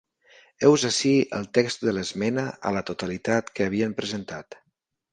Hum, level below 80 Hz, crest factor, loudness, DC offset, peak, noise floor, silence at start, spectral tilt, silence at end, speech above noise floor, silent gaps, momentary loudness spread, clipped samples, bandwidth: none; -60 dBFS; 22 dB; -24 LUFS; under 0.1%; -4 dBFS; -76 dBFS; 0.6 s; -4.5 dB/octave; 0.6 s; 52 dB; none; 11 LU; under 0.1%; 10 kHz